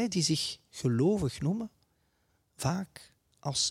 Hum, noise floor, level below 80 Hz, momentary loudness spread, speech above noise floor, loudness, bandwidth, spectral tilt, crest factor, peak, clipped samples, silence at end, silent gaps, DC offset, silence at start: none; -73 dBFS; -60 dBFS; 11 LU; 43 dB; -31 LUFS; 16 kHz; -4.5 dB/octave; 18 dB; -14 dBFS; under 0.1%; 0 s; none; under 0.1%; 0 s